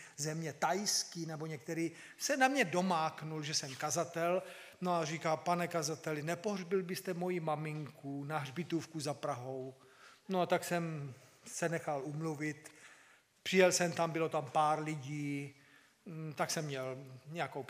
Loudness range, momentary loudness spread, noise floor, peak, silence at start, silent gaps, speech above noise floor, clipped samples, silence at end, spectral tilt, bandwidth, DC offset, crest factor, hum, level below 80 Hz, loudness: 5 LU; 13 LU; -65 dBFS; -14 dBFS; 0 s; none; 29 dB; under 0.1%; 0 s; -4 dB/octave; 15.5 kHz; under 0.1%; 22 dB; none; -86 dBFS; -37 LUFS